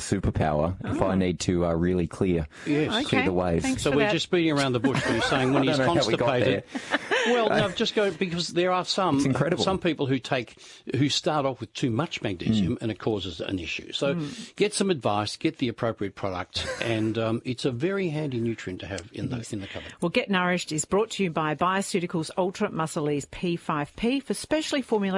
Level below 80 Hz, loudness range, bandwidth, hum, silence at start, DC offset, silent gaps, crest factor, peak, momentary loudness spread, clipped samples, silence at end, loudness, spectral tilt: -50 dBFS; 5 LU; 11.5 kHz; none; 0 s; under 0.1%; none; 18 dB; -8 dBFS; 8 LU; under 0.1%; 0 s; -26 LUFS; -5 dB/octave